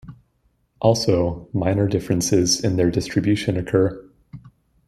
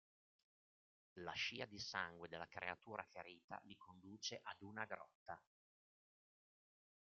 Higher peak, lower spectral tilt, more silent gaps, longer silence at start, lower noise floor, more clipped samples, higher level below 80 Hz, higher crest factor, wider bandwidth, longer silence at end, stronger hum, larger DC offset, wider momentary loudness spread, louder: first, -2 dBFS vs -28 dBFS; first, -5.5 dB/octave vs -1 dB/octave; second, none vs 3.44-3.48 s, 5.15-5.26 s; second, 0.05 s vs 1.15 s; second, -65 dBFS vs under -90 dBFS; neither; first, -46 dBFS vs -86 dBFS; second, 18 dB vs 26 dB; first, 15 kHz vs 7.4 kHz; second, 0.4 s vs 1.75 s; neither; neither; second, 5 LU vs 13 LU; first, -20 LUFS vs -50 LUFS